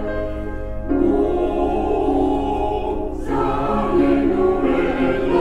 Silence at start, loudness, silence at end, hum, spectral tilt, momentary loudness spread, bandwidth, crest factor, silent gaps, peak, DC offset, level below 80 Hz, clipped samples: 0 s; -20 LUFS; 0 s; none; -8 dB/octave; 9 LU; 9.2 kHz; 14 dB; none; -6 dBFS; under 0.1%; -30 dBFS; under 0.1%